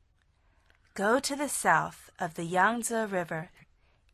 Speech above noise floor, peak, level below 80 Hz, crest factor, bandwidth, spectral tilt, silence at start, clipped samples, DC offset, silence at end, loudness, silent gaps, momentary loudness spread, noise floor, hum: 38 dB; -10 dBFS; -66 dBFS; 22 dB; 13.5 kHz; -3.5 dB/octave; 0.95 s; under 0.1%; under 0.1%; 0.65 s; -29 LUFS; none; 13 LU; -68 dBFS; none